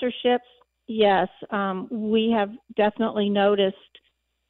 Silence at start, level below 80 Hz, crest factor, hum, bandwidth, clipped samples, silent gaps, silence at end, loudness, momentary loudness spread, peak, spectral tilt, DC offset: 0 s; -64 dBFS; 16 dB; none; 4.3 kHz; under 0.1%; none; 0.75 s; -23 LUFS; 8 LU; -8 dBFS; -9.5 dB/octave; under 0.1%